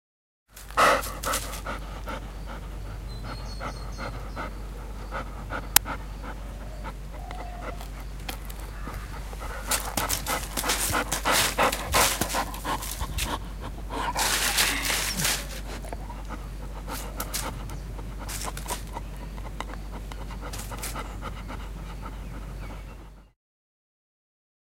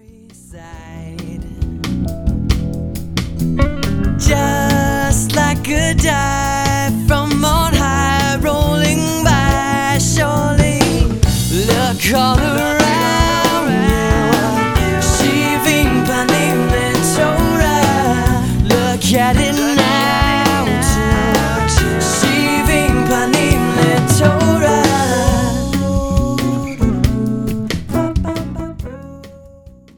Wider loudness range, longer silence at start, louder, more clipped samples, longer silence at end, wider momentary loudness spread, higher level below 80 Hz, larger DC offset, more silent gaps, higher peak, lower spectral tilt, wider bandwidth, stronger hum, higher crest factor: first, 13 LU vs 5 LU; about the same, 0.5 s vs 0.5 s; second, -29 LUFS vs -14 LUFS; neither; first, 1.4 s vs 0.3 s; first, 17 LU vs 8 LU; second, -38 dBFS vs -22 dBFS; neither; neither; about the same, 0 dBFS vs 0 dBFS; second, -2 dB/octave vs -4.5 dB/octave; second, 17 kHz vs 19.5 kHz; neither; first, 30 dB vs 14 dB